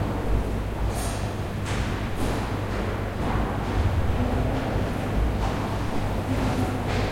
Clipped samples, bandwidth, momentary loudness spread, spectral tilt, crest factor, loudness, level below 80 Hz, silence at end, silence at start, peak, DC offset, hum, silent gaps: under 0.1%; 16.5 kHz; 4 LU; -6.5 dB/octave; 14 dB; -27 LUFS; -30 dBFS; 0 s; 0 s; -12 dBFS; under 0.1%; none; none